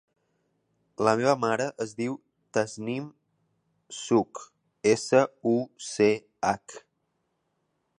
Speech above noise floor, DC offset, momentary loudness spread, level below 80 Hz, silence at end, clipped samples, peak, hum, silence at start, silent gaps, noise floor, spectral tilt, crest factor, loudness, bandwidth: 51 dB; under 0.1%; 17 LU; -70 dBFS; 1.2 s; under 0.1%; -6 dBFS; none; 1 s; none; -76 dBFS; -5 dB/octave; 22 dB; -27 LUFS; 11 kHz